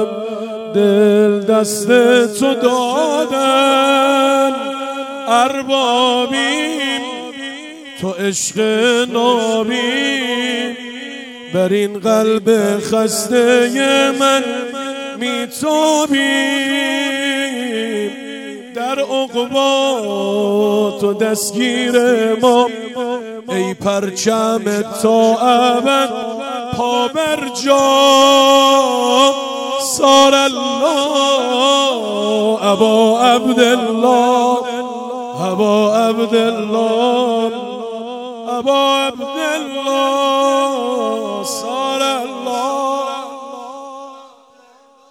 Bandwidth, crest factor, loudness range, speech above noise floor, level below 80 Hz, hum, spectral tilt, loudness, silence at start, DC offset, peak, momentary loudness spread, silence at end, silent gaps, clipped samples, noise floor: 17 kHz; 14 dB; 5 LU; 34 dB; -62 dBFS; none; -3 dB/octave; -14 LUFS; 0 s; under 0.1%; 0 dBFS; 12 LU; 0.85 s; none; under 0.1%; -48 dBFS